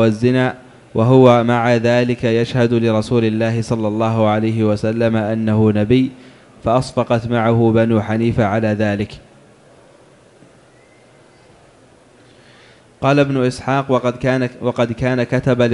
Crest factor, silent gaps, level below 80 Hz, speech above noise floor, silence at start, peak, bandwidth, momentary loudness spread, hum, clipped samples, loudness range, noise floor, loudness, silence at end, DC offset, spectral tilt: 16 dB; none; -44 dBFS; 33 dB; 0 s; 0 dBFS; 11.5 kHz; 6 LU; none; under 0.1%; 8 LU; -48 dBFS; -16 LUFS; 0 s; under 0.1%; -7.5 dB/octave